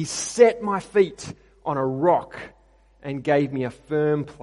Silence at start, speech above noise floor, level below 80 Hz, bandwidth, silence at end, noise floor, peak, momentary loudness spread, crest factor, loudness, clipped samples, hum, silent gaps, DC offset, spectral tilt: 0 s; 34 dB; -58 dBFS; 11.5 kHz; 0 s; -56 dBFS; -2 dBFS; 20 LU; 22 dB; -22 LUFS; under 0.1%; none; none; under 0.1%; -5 dB/octave